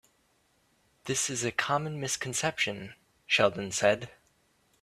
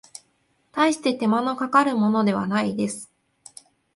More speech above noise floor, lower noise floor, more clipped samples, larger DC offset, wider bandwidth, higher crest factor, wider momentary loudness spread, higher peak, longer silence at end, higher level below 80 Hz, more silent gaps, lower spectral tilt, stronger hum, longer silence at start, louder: second, 40 dB vs 46 dB; about the same, -70 dBFS vs -67 dBFS; neither; neither; first, 15 kHz vs 11.5 kHz; first, 24 dB vs 18 dB; first, 15 LU vs 9 LU; second, -8 dBFS vs -4 dBFS; second, 0.7 s vs 0.9 s; about the same, -66 dBFS vs -68 dBFS; neither; second, -2.5 dB/octave vs -5 dB/octave; neither; first, 1.05 s vs 0.75 s; second, -29 LUFS vs -22 LUFS